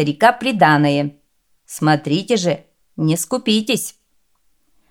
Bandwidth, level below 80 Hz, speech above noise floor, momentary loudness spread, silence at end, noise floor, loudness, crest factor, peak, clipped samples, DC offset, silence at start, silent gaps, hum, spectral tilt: 18 kHz; -62 dBFS; 49 dB; 14 LU; 1 s; -65 dBFS; -17 LUFS; 18 dB; 0 dBFS; under 0.1%; under 0.1%; 0 s; none; none; -5 dB/octave